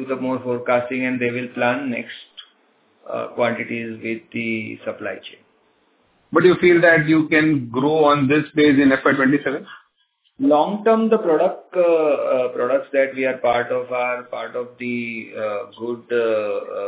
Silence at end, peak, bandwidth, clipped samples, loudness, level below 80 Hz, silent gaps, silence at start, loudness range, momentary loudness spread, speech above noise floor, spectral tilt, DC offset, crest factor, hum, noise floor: 0 s; -2 dBFS; 4 kHz; under 0.1%; -19 LUFS; -60 dBFS; none; 0 s; 11 LU; 14 LU; 46 dB; -10 dB/octave; under 0.1%; 18 dB; none; -65 dBFS